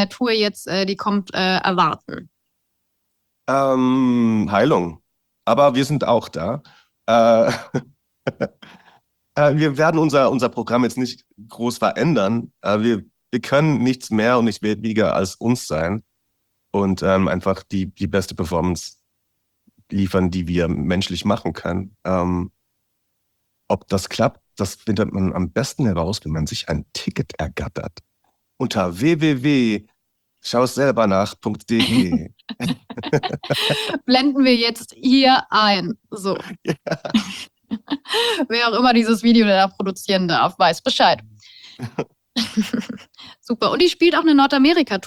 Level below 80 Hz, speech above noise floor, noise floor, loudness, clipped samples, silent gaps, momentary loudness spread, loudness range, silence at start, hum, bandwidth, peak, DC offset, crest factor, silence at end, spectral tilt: -50 dBFS; 53 dB; -72 dBFS; -19 LUFS; under 0.1%; none; 13 LU; 6 LU; 0 s; none; 15.5 kHz; -4 dBFS; under 0.1%; 16 dB; 0 s; -5.5 dB/octave